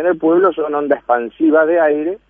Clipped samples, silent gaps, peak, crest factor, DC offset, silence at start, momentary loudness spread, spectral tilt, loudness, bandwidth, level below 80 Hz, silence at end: under 0.1%; none; -2 dBFS; 14 dB; under 0.1%; 0 s; 6 LU; -9.5 dB/octave; -15 LUFS; 3.6 kHz; -56 dBFS; 0.15 s